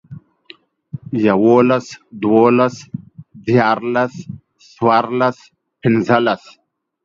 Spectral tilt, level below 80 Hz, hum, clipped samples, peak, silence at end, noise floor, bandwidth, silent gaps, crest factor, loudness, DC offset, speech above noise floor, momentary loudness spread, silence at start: -7 dB/octave; -58 dBFS; none; under 0.1%; 0 dBFS; 0.7 s; -46 dBFS; 7.6 kHz; none; 16 dB; -15 LUFS; under 0.1%; 31 dB; 21 LU; 0.1 s